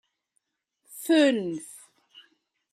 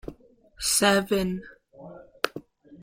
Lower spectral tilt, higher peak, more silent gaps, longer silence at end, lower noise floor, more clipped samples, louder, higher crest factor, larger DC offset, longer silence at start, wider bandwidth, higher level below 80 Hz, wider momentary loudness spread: about the same, -4 dB/octave vs -3 dB/octave; second, -10 dBFS vs -4 dBFS; neither; first, 0.95 s vs 0 s; first, -77 dBFS vs -53 dBFS; neither; about the same, -24 LUFS vs -25 LUFS; second, 18 dB vs 26 dB; neither; first, 0.9 s vs 0.05 s; second, 14.5 kHz vs 16.5 kHz; second, -82 dBFS vs -52 dBFS; about the same, 23 LU vs 25 LU